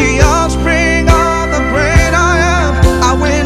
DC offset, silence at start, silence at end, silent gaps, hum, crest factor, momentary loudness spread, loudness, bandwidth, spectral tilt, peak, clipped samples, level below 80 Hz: under 0.1%; 0 s; 0 s; none; none; 10 dB; 3 LU; -10 LUFS; 14 kHz; -5 dB/octave; 0 dBFS; 0.4%; -16 dBFS